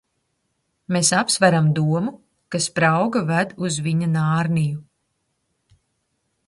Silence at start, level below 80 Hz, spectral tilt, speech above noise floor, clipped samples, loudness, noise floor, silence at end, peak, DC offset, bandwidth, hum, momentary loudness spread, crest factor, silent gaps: 0.9 s; -60 dBFS; -4.5 dB/octave; 53 dB; under 0.1%; -20 LUFS; -72 dBFS; 1.65 s; -2 dBFS; under 0.1%; 11.5 kHz; none; 9 LU; 20 dB; none